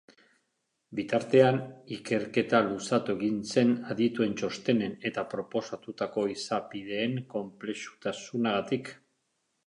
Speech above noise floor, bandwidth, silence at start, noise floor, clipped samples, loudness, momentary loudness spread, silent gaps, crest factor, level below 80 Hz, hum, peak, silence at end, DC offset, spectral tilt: 50 dB; 11 kHz; 0.9 s; -79 dBFS; under 0.1%; -30 LUFS; 12 LU; none; 22 dB; -70 dBFS; none; -8 dBFS; 0.75 s; under 0.1%; -5.5 dB/octave